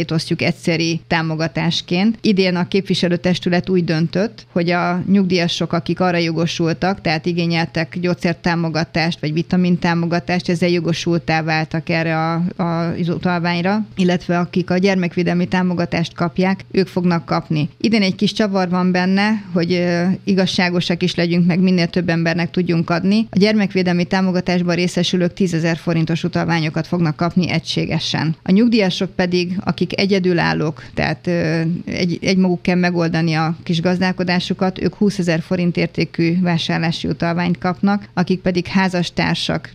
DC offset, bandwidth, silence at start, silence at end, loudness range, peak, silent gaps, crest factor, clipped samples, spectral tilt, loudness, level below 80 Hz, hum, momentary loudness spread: under 0.1%; 10 kHz; 0 s; 0.05 s; 2 LU; 0 dBFS; none; 18 dB; under 0.1%; -6.5 dB/octave; -18 LUFS; -48 dBFS; none; 4 LU